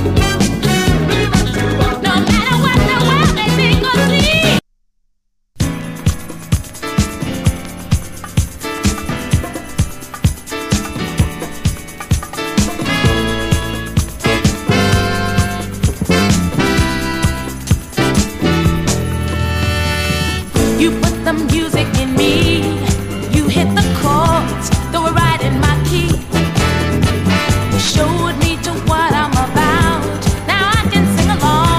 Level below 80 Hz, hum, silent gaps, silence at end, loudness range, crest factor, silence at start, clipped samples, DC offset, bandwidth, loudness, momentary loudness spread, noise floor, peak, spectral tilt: -24 dBFS; none; none; 0 s; 6 LU; 14 dB; 0 s; under 0.1%; under 0.1%; 15.5 kHz; -15 LUFS; 8 LU; -62 dBFS; 0 dBFS; -5 dB/octave